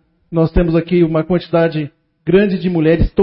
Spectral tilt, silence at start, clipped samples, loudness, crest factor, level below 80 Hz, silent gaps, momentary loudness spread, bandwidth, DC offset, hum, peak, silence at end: -13 dB/octave; 0.3 s; under 0.1%; -15 LUFS; 14 dB; -28 dBFS; none; 9 LU; 5.6 kHz; under 0.1%; none; 0 dBFS; 0 s